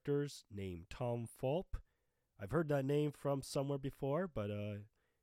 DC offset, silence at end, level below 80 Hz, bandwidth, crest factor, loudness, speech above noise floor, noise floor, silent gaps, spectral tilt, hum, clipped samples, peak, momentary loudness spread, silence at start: under 0.1%; 0.35 s; -60 dBFS; 15.5 kHz; 18 dB; -41 LUFS; 43 dB; -83 dBFS; none; -7 dB/octave; none; under 0.1%; -24 dBFS; 11 LU; 0.05 s